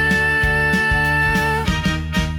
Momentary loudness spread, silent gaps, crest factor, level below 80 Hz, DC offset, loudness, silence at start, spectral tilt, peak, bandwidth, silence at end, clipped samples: 5 LU; none; 10 dB; -28 dBFS; under 0.1%; -17 LUFS; 0 s; -5 dB/octave; -8 dBFS; 18 kHz; 0 s; under 0.1%